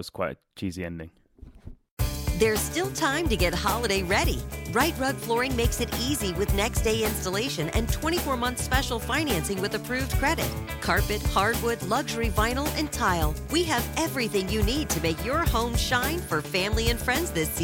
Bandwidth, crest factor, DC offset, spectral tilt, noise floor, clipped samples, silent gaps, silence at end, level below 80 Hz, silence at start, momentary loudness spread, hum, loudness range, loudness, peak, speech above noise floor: 17 kHz; 18 dB; under 0.1%; -4 dB/octave; -46 dBFS; under 0.1%; 1.91-1.97 s; 0 s; -34 dBFS; 0 s; 6 LU; none; 1 LU; -26 LUFS; -8 dBFS; 20 dB